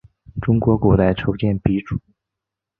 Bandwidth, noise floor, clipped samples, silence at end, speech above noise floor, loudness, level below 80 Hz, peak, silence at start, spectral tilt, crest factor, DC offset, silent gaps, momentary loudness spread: 4.4 kHz; -84 dBFS; under 0.1%; 0.8 s; 67 dB; -19 LUFS; -36 dBFS; -2 dBFS; 0.35 s; -11 dB/octave; 18 dB; under 0.1%; none; 14 LU